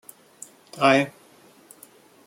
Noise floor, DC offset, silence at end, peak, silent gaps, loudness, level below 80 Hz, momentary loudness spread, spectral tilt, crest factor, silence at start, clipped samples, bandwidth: -53 dBFS; under 0.1%; 1.15 s; -4 dBFS; none; -21 LUFS; -72 dBFS; 25 LU; -4.5 dB/octave; 22 dB; 0.75 s; under 0.1%; 16.5 kHz